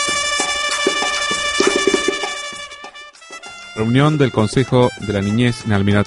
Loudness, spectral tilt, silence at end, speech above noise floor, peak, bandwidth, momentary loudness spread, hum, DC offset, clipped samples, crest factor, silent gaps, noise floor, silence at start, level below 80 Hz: -17 LUFS; -4 dB/octave; 0 s; 22 dB; 0 dBFS; 11.5 kHz; 18 LU; none; under 0.1%; under 0.1%; 18 dB; none; -37 dBFS; 0 s; -44 dBFS